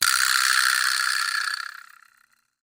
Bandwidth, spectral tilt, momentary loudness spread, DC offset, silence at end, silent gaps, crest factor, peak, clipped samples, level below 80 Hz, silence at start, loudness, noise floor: 16.5 kHz; 5 dB/octave; 11 LU; under 0.1%; 0.9 s; none; 22 dB; -2 dBFS; under 0.1%; -66 dBFS; 0 s; -21 LUFS; -64 dBFS